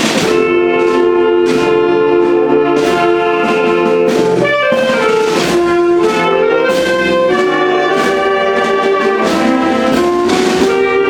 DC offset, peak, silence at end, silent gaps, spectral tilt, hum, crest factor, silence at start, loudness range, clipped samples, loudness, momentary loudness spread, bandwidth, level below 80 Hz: under 0.1%; 0 dBFS; 0 s; none; -4.5 dB/octave; none; 10 dB; 0 s; 1 LU; under 0.1%; -11 LUFS; 1 LU; 16 kHz; -44 dBFS